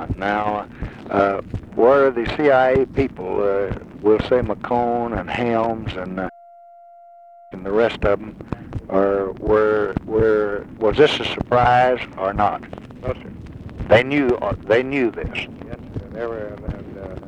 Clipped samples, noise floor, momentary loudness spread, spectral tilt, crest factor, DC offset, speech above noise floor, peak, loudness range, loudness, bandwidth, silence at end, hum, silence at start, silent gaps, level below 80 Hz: under 0.1%; -45 dBFS; 17 LU; -7 dB/octave; 20 dB; under 0.1%; 25 dB; 0 dBFS; 6 LU; -19 LUFS; 9 kHz; 0 s; none; 0 s; none; -40 dBFS